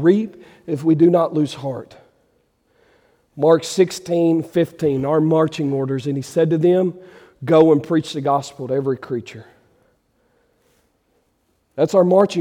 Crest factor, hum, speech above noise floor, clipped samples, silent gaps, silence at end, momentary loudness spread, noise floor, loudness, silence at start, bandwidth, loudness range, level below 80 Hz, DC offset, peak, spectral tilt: 16 dB; none; 48 dB; under 0.1%; none; 0 s; 14 LU; -65 dBFS; -18 LUFS; 0 s; 15 kHz; 8 LU; -62 dBFS; under 0.1%; -2 dBFS; -7 dB/octave